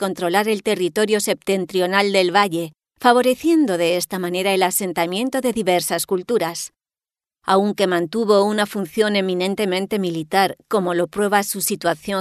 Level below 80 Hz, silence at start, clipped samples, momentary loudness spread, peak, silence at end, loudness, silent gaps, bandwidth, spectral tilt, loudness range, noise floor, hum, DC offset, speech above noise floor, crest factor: -62 dBFS; 0 s; under 0.1%; 6 LU; -2 dBFS; 0 s; -19 LUFS; none; 13.5 kHz; -4 dB/octave; 3 LU; under -90 dBFS; none; under 0.1%; over 71 dB; 18 dB